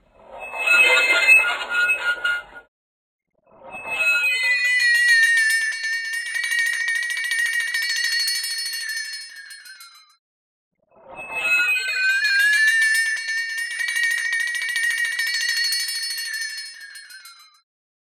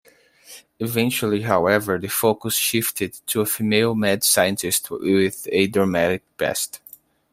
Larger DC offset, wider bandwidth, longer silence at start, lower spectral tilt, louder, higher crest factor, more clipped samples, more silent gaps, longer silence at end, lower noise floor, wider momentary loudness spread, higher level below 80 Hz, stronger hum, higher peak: neither; about the same, 17.5 kHz vs 16 kHz; second, 0.3 s vs 0.5 s; second, 3 dB/octave vs -3.5 dB/octave; about the same, -18 LUFS vs -20 LUFS; about the same, 20 dB vs 20 dB; neither; first, 2.68-3.19 s, 10.19-10.71 s vs none; first, 0.8 s vs 0.55 s; second, -45 dBFS vs -49 dBFS; first, 18 LU vs 6 LU; second, -68 dBFS vs -60 dBFS; neither; about the same, -4 dBFS vs -2 dBFS